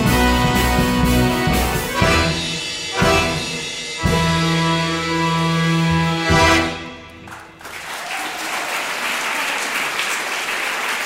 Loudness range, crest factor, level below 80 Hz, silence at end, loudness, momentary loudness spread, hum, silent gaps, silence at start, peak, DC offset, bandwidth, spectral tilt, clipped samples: 5 LU; 16 dB; -30 dBFS; 0 s; -18 LUFS; 11 LU; none; none; 0 s; -2 dBFS; under 0.1%; 16.5 kHz; -4 dB/octave; under 0.1%